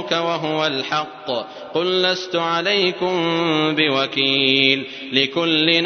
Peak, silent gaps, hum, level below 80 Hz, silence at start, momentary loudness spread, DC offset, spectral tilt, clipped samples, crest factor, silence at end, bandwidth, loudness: 0 dBFS; none; none; -68 dBFS; 0 s; 8 LU; under 0.1%; -4.5 dB/octave; under 0.1%; 20 dB; 0 s; 6.6 kHz; -18 LUFS